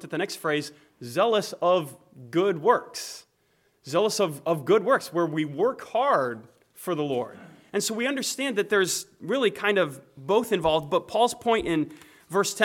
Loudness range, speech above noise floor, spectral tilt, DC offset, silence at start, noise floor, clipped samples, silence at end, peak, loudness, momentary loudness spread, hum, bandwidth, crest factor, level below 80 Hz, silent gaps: 2 LU; 42 dB; -4 dB/octave; under 0.1%; 0 s; -68 dBFS; under 0.1%; 0 s; -6 dBFS; -25 LUFS; 11 LU; none; 17.5 kHz; 20 dB; -62 dBFS; none